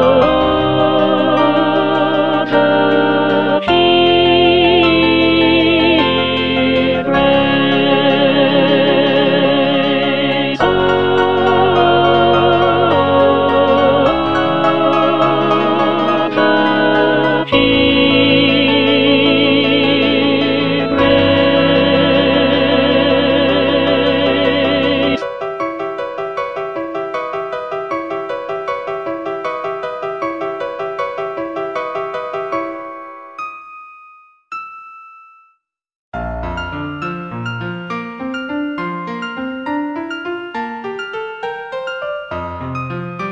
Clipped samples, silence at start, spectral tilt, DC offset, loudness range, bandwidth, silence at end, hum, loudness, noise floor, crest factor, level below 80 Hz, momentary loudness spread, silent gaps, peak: under 0.1%; 0 s; -7 dB/octave; under 0.1%; 13 LU; 7.2 kHz; 0 s; none; -14 LUFS; -60 dBFS; 14 dB; -42 dBFS; 13 LU; 35.95-36.12 s; 0 dBFS